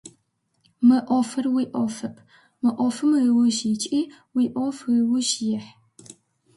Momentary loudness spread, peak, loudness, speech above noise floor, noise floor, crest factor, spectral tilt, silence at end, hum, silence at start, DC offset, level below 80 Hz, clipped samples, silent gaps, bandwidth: 9 LU; -8 dBFS; -22 LUFS; 49 dB; -70 dBFS; 16 dB; -4 dB/octave; 0.45 s; none; 0.05 s; under 0.1%; -70 dBFS; under 0.1%; none; 11.5 kHz